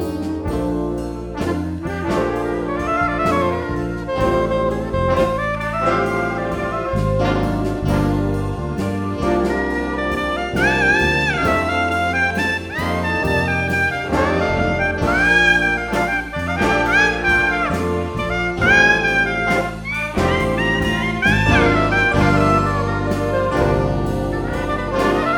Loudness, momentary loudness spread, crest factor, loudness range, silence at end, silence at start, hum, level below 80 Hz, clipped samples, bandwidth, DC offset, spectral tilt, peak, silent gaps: -18 LUFS; 8 LU; 18 dB; 4 LU; 0 s; 0 s; none; -32 dBFS; under 0.1%; 19 kHz; under 0.1%; -6 dB/octave; 0 dBFS; none